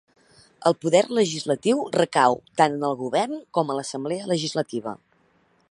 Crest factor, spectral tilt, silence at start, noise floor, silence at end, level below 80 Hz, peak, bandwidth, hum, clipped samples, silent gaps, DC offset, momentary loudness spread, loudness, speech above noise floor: 22 dB; -4.5 dB/octave; 0.6 s; -63 dBFS; 0.75 s; -70 dBFS; -2 dBFS; 11.5 kHz; none; under 0.1%; none; under 0.1%; 9 LU; -23 LUFS; 40 dB